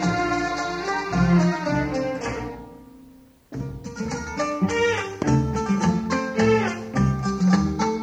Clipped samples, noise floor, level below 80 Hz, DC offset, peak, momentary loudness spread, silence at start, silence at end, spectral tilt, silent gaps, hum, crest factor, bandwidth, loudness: under 0.1%; -50 dBFS; -40 dBFS; under 0.1%; -6 dBFS; 13 LU; 0 s; 0 s; -6.5 dB/octave; none; none; 16 dB; 9 kHz; -23 LUFS